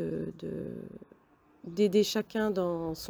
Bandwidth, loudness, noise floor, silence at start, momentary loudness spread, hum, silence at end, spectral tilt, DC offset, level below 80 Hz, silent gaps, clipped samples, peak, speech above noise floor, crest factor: over 20 kHz; -31 LUFS; -63 dBFS; 0 s; 20 LU; none; 0 s; -5.5 dB/octave; under 0.1%; -62 dBFS; none; under 0.1%; -14 dBFS; 33 dB; 18 dB